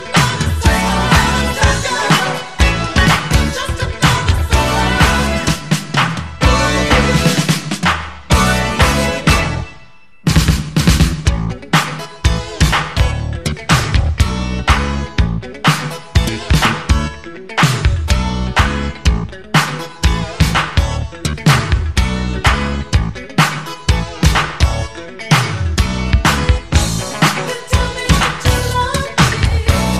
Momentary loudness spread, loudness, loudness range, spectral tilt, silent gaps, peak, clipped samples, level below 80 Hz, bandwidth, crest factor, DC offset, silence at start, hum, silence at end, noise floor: 7 LU; -15 LUFS; 2 LU; -4.5 dB/octave; none; 0 dBFS; under 0.1%; -20 dBFS; 15 kHz; 14 dB; 1%; 0 s; none; 0 s; -44 dBFS